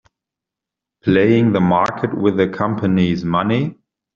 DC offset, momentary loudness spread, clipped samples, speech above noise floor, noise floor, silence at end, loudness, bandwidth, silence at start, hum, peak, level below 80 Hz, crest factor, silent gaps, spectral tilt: under 0.1%; 6 LU; under 0.1%; 69 dB; -85 dBFS; 0.45 s; -17 LUFS; 7.2 kHz; 1.05 s; none; -2 dBFS; -52 dBFS; 16 dB; none; -6.5 dB/octave